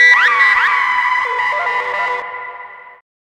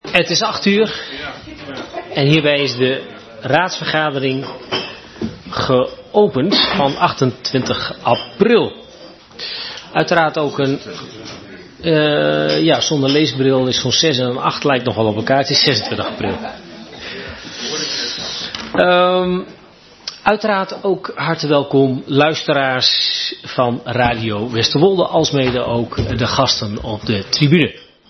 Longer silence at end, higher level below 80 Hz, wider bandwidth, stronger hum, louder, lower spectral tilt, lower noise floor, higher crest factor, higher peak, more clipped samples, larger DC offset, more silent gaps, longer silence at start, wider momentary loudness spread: first, 0.4 s vs 0.25 s; second, -60 dBFS vs -46 dBFS; first, 12.5 kHz vs 6.4 kHz; neither; first, -13 LUFS vs -16 LUFS; second, 0.5 dB/octave vs -4.5 dB/octave; second, -34 dBFS vs -43 dBFS; about the same, 16 dB vs 16 dB; about the same, 0 dBFS vs 0 dBFS; neither; neither; neither; about the same, 0 s vs 0.05 s; first, 19 LU vs 15 LU